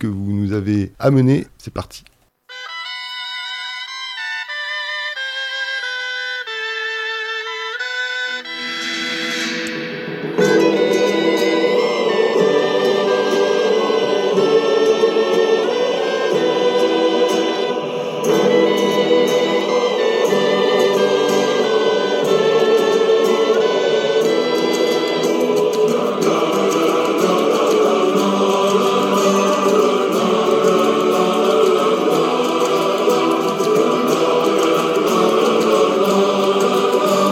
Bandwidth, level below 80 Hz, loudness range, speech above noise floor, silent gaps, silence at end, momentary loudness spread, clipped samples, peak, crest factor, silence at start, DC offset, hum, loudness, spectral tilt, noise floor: 16.5 kHz; -60 dBFS; 7 LU; 20 dB; none; 0 s; 8 LU; under 0.1%; -2 dBFS; 14 dB; 0 s; under 0.1%; none; -16 LUFS; -4.5 dB/octave; -38 dBFS